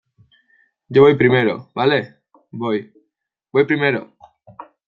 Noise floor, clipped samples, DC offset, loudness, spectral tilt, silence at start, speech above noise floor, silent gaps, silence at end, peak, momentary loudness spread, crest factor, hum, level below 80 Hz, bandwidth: -75 dBFS; under 0.1%; under 0.1%; -17 LUFS; -8.5 dB/octave; 0.9 s; 59 dB; none; 0.25 s; -2 dBFS; 14 LU; 18 dB; none; -58 dBFS; 5.4 kHz